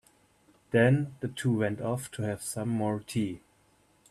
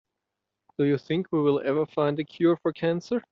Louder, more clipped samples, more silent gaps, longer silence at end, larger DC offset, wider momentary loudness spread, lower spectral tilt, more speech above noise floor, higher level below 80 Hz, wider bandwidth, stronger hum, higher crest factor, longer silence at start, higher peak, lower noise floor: second, -30 LUFS vs -26 LUFS; neither; neither; first, 0.7 s vs 0.1 s; neither; first, 10 LU vs 4 LU; about the same, -6.5 dB/octave vs -6.5 dB/octave; second, 37 dB vs 60 dB; about the same, -64 dBFS vs -68 dBFS; first, 13.5 kHz vs 7 kHz; neither; first, 22 dB vs 16 dB; about the same, 0.7 s vs 0.8 s; about the same, -10 dBFS vs -12 dBFS; second, -66 dBFS vs -85 dBFS